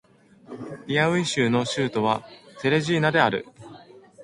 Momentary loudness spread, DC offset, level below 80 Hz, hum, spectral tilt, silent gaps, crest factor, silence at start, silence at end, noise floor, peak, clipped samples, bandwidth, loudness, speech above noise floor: 17 LU; under 0.1%; -62 dBFS; none; -5 dB/octave; none; 20 dB; 0.5 s; 0 s; -47 dBFS; -4 dBFS; under 0.1%; 11.5 kHz; -23 LUFS; 24 dB